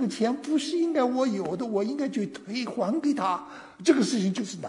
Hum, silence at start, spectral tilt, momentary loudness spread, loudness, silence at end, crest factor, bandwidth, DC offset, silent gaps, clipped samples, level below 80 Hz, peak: none; 0 s; -5 dB/octave; 9 LU; -27 LUFS; 0 s; 18 dB; 11 kHz; under 0.1%; none; under 0.1%; -74 dBFS; -8 dBFS